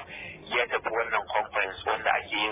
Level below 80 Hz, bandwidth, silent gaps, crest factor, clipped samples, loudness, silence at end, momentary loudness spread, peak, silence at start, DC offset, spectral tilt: -58 dBFS; 4 kHz; none; 18 dB; under 0.1%; -28 LUFS; 0 s; 3 LU; -12 dBFS; 0 s; under 0.1%; 0.5 dB/octave